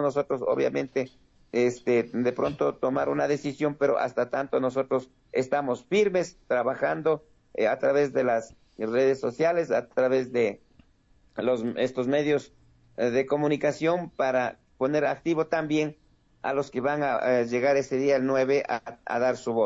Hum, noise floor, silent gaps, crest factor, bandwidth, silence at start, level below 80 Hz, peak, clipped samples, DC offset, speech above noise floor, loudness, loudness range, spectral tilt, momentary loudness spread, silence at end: none; -61 dBFS; none; 14 dB; 7.8 kHz; 0 s; -64 dBFS; -12 dBFS; under 0.1%; under 0.1%; 36 dB; -26 LUFS; 2 LU; -6 dB/octave; 7 LU; 0 s